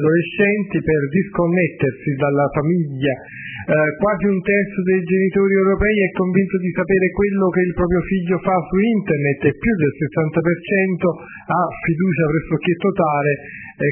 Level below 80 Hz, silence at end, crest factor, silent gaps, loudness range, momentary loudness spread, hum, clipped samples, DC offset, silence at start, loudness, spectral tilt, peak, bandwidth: -40 dBFS; 0 s; 14 dB; none; 2 LU; 5 LU; none; under 0.1%; under 0.1%; 0 s; -18 LUFS; -12 dB/octave; -2 dBFS; 3.3 kHz